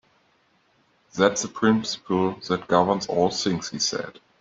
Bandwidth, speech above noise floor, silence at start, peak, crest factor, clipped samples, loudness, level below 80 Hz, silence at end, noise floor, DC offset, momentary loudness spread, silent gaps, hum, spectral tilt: 7.8 kHz; 41 dB; 1.15 s; -2 dBFS; 22 dB; under 0.1%; -23 LUFS; -62 dBFS; 0.3 s; -64 dBFS; under 0.1%; 7 LU; none; none; -4 dB/octave